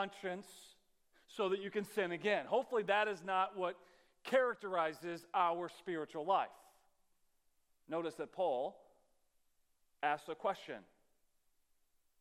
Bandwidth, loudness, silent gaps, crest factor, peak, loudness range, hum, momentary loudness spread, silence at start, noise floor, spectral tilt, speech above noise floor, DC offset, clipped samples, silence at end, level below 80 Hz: 16 kHz; -38 LUFS; none; 22 dB; -18 dBFS; 8 LU; none; 12 LU; 0 s; -76 dBFS; -4.5 dB/octave; 38 dB; under 0.1%; under 0.1%; 1.4 s; -86 dBFS